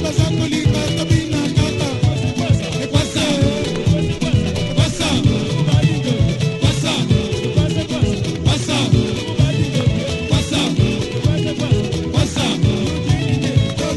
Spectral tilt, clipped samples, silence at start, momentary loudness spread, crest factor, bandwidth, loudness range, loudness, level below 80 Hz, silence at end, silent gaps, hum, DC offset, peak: -5.5 dB/octave; under 0.1%; 0 s; 3 LU; 16 dB; 12 kHz; 1 LU; -17 LUFS; -30 dBFS; 0 s; none; none; 0.2%; 0 dBFS